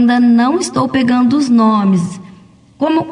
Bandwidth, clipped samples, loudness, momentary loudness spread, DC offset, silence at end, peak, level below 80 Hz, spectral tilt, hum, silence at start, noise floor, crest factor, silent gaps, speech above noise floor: 11 kHz; under 0.1%; -12 LUFS; 8 LU; under 0.1%; 0 s; -2 dBFS; -56 dBFS; -6 dB/octave; none; 0 s; -42 dBFS; 10 dB; none; 30 dB